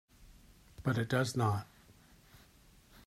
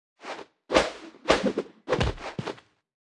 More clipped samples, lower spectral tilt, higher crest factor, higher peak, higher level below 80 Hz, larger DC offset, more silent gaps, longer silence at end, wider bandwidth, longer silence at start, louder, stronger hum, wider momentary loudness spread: neither; first, -6 dB/octave vs -4.5 dB/octave; second, 20 dB vs 26 dB; second, -18 dBFS vs -4 dBFS; second, -62 dBFS vs -44 dBFS; neither; neither; first, 1.45 s vs 0.6 s; first, 15 kHz vs 12 kHz; about the same, 0.2 s vs 0.2 s; second, -34 LUFS vs -27 LUFS; neither; second, 8 LU vs 16 LU